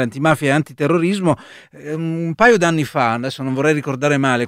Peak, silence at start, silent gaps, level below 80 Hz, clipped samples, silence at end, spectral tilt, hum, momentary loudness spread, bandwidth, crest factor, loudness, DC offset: 0 dBFS; 0 s; none; -54 dBFS; under 0.1%; 0 s; -6 dB/octave; none; 10 LU; 15.5 kHz; 16 dB; -17 LUFS; under 0.1%